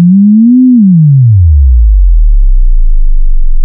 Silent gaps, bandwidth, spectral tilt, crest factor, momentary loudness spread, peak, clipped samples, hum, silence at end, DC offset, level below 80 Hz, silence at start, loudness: none; 0.3 kHz; -17 dB/octave; 4 dB; 10 LU; 0 dBFS; 3%; none; 0 s; under 0.1%; -6 dBFS; 0 s; -7 LUFS